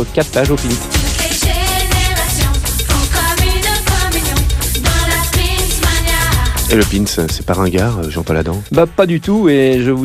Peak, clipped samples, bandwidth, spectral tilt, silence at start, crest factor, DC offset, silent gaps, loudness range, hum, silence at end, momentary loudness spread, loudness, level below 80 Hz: 0 dBFS; under 0.1%; 16 kHz; -4 dB/octave; 0 s; 12 dB; under 0.1%; none; 1 LU; none; 0 s; 4 LU; -14 LUFS; -20 dBFS